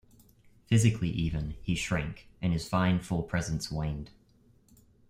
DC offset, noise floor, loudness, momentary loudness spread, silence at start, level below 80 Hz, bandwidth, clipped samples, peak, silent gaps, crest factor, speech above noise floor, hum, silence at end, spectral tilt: under 0.1%; -63 dBFS; -31 LUFS; 10 LU; 0.7 s; -46 dBFS; 15.5 kHz; under 0.1%; -10 dBFS; none; 20 dB; 33 dB; none; 1 s; -6 dB/octave